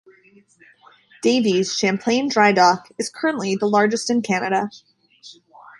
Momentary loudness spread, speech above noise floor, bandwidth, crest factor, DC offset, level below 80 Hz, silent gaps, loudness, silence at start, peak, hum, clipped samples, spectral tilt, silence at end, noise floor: 8 LU; 27 dB; 11.5 kHz; 20 dB; under 0.1%; -68 dBFS; none; -19 LUFS; 1.25 s; -2 dBFS; none; under 0.1%; -4 dB/octave; 0.45 s; -47 dBFS